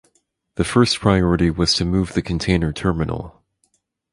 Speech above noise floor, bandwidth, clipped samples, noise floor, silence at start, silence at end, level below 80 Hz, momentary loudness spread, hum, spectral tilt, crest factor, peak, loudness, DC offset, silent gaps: 49 dB; 11.5 kHz; under 0.1%; -67 dBFS; 0.55 s; 0.85 s; -34 dBFS; 9 LU; none; -5.5 dB/octave; 20 dB; 0 dBFS; -19 LUFS; under 0.1%; none